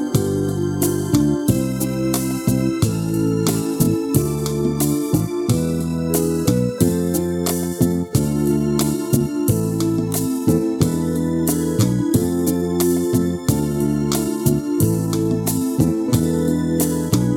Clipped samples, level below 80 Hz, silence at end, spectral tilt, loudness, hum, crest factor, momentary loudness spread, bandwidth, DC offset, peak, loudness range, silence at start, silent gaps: under 0.1%; -40 dBFS; 0 s; -6 dB/octave; -19 LUFS; none; 16 dB; 2 LU; 18.5 kHz; under 0.1%; -2 dBFS; 1 LU; 0 s; none